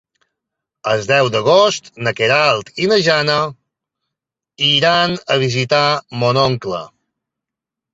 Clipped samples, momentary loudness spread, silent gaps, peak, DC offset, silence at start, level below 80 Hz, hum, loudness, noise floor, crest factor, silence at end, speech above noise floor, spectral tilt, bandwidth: under 0.1%; 9 LU; none; 0 dBFS; under 0.1%; 0.85 s; -54 dBFS; none; -15 LUFS; -84 dBFS; 16 dB; 1.05 s; 69 dB; -4 dB/octave; 8 kHz